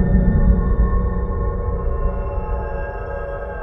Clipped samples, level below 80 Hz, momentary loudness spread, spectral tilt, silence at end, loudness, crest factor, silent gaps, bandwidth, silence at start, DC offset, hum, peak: under 0.1%; -20 dBFS; 10 LU; -12.5 dB/octave; 0 s; -22 LUFS; 16 dB; none; 2.9 kHz; 0 s; under 0.1%; none; -2 dBFS